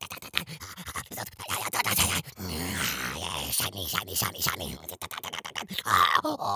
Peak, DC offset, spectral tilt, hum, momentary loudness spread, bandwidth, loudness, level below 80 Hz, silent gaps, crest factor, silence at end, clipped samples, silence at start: -2 dBFS; under 0.1%; -2 dB/octave; none; 13 LU; 16 kHz; -28 LUFS; -50 dBFS; none; 28 dB; 0 s; under 0.1%; 0 s